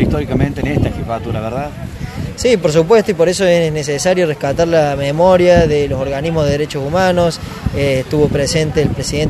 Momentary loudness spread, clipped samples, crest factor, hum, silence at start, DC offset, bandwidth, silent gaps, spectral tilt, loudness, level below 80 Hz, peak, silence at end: 11 LU; under 0.1%; 14 dB; none; 0 s; under 0.1%; 13 kHz; none; -5.5 dB/octave; -14 LUFS; -30 dBFS; 0 dBFS; 0 s